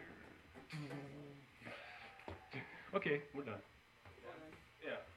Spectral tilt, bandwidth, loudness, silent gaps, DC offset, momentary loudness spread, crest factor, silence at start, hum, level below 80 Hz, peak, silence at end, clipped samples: -6.5 dB/octave; 15.5 kHz; -48 LUFS; none; under 0.1%; 18 LU; 24 dB; 0 s; none; -76 dBFS; -26 dBFS; 0 s; under 0.1%